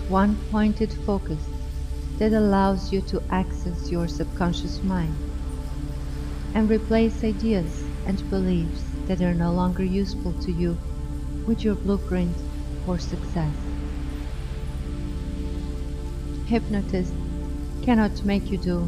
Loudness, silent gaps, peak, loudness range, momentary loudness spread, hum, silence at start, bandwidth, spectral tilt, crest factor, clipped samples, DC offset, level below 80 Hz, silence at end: -26 LUFS; none; -6 dBFS; 6 LU; 11 LU; 50 Hz at -55 dBFS; 0 s; 13.5 kHz; -7.5 dB/octave; 18 dB; under 0.1%; under 0.1%; -30 dBFS; 0 s